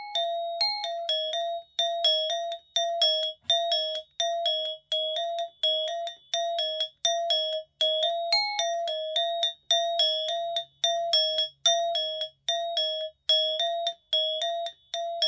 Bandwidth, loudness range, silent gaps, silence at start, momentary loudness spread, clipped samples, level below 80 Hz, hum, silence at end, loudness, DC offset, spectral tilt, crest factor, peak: 8 kHz; 2 LU; none; 0 s; 8 LU; under 0.1%; -78 dBFS; none; 0 s; -26 LUFS; under 0.1%; 3 dB/octave; 14 dB; -14 dBFS